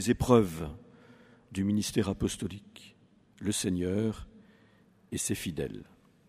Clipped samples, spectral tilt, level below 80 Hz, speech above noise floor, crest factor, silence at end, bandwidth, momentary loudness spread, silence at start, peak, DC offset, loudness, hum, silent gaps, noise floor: under 0.1%; -5.5 dB/octave; -50 dBFS; 32 dB; 24 dB; 0.45 s; 15.5 kHz; 21 LU; 0 s; -8 dBFS; under 0.1%; -31 LUFS; none; none; -62 dBFS